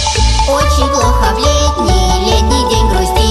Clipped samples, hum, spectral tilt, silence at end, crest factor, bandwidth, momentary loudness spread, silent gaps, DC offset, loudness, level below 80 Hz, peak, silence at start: under 0.1%; none; -4.5 dB/octave; 0 s; 10 dB; 13 kHz; 1 LU; none; under 0.1%; -11 LUFS; -14 dBFS; 0 dBFS; 0 s